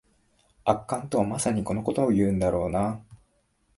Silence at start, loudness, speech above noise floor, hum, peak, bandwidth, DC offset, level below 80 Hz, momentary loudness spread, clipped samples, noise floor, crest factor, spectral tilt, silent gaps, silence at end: 0.65 s; -26 LUFS; 43 dB; none; -6 dBFS; 11.5 kHz; under 0.1%; -48 dBFS; 6 LU; under 0.1%; -68 dBFS; 22 dB; -6.5 dB/octave; none; 0.6 s